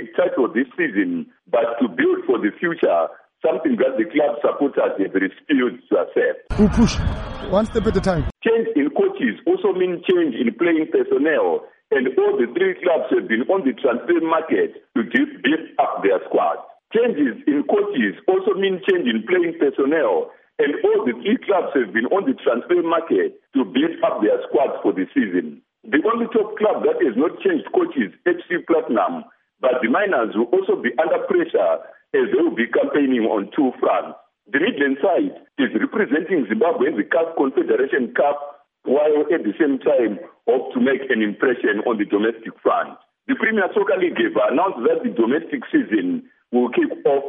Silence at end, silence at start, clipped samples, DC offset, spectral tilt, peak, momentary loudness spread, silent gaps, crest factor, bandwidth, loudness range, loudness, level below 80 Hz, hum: 0 s; 0 s; under 0.1%; under 0.1%; -4.5 dB/octave; -4 dBFS; 5 LU; none; 16 dB; 8 kHz; 1 LU; -20 LUFS; -42 dBFS; none